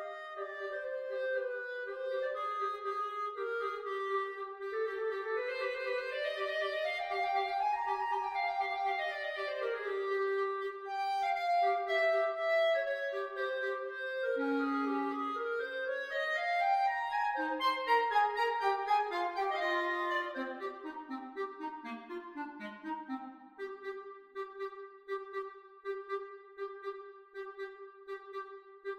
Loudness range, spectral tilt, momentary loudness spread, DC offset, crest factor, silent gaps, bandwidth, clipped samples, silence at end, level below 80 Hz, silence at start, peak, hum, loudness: 12 LU; -3 dB/octave; 14 LU; under 0.1%; 18 dB; none; 15.5 kHz; under 0.1%; 0 s; -78 dBFS; 0 s; -18 dBFS; none; -35 LUFS